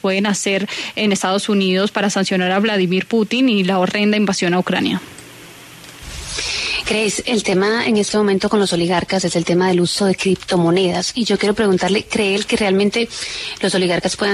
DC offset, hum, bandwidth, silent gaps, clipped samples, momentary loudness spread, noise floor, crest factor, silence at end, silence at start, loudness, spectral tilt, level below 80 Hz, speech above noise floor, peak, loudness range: under 0.1%; none; 13.5 kHz; none; under 0.1%; 7 LU; -39 dBFS; 14 dB; 0 s; 0.05 s; -17 LUFS; -4.5 dB/octave; -46 dBFS; 22 dB; -4 dBFS; 3 LU